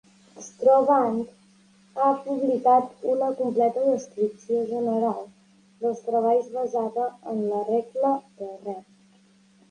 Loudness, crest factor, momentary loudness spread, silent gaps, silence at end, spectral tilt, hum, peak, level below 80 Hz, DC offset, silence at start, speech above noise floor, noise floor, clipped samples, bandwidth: -24 LUFS; 18 dB; 16 LU; none; 0.9 s; -7 dB/octave; none; -8 dBFS; -74 dBFS; under 0.1%; 0.35 s; 34 dB; -58 dBFS; under 0.1%; 10 kHz